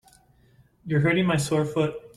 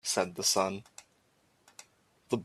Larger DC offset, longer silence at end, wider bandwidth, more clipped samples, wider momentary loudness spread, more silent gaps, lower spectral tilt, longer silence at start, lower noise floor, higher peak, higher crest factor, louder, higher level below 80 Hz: neither; about the same, 0.1 s vs 0 s; second, 13.5 kHz vs 15.5 kHz; neither; second, 6 LU vs 26 LU; neither; first, -6 dB/octave vs -2.5 dB/octave; first, 0.85 s vs 0.05 s; second, -59 dBFS vs -70 dBFS; first, -10 dBFS vs -14 dBFS; second, 16 dB vs 22 dB; first, -24 LUFS vs -30 LUFS; first, -56 dBFS vs -74 dBFS